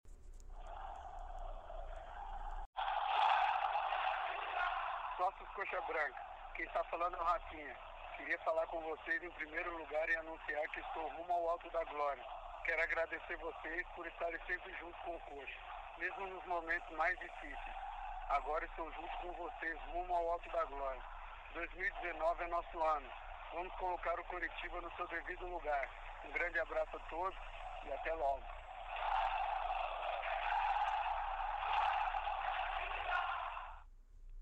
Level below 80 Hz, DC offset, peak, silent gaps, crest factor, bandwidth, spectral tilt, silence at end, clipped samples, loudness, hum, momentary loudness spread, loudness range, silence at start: -54 dBFS; under 0.1%; -22 dBFS; 2.66-2.73 s; 18 dB; 8.8 kHz; -4.5 dB/octave; 0 s; under 0.1%; -41 LUFS; none; 13 LU; 4 LU; 0.05 s